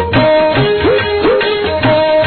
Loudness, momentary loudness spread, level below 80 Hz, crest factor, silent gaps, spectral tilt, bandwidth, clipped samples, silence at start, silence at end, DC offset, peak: -11 LUFS; 3 LU; -34 dBFS; 10 dB; none; -3.5 dB/octave; 4.6 kHz; under 0.1%; 0 s; 0 s; under 0.1%; 0 dBFS